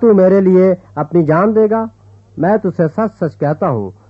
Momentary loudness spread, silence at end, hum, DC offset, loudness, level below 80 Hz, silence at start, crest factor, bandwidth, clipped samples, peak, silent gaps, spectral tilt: 9 LU; 0.2 s; none; under 0.1%; -13 LUFS; -52 dBFS; 0 s; 12 dB; 5.4 kHz; under 0.1%; 0 dBFS; none; -11 dB/octave